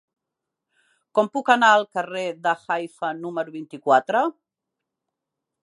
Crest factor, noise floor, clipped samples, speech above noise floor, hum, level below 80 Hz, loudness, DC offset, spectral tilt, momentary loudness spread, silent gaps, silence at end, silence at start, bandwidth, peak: 22 dB; -84 dBFS; under 0.1%; 63 dB; none; -84 dBFS; -22 LUFS; under 0.1%; -4 dB/octave; 13 LU; none; 1.35 s; 1.15 s; 11.5 kHz; -2 dBFS